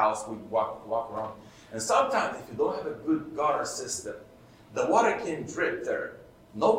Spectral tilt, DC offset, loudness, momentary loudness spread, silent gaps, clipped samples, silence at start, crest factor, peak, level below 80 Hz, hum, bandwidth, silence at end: -4 dB/octave; under 0.1%; -29 LUFS; 15 LU; none; under 0.1%; 0 s; 20 dB; -8 dBFS; -64 dBFS; none; 16 kHz; 0 s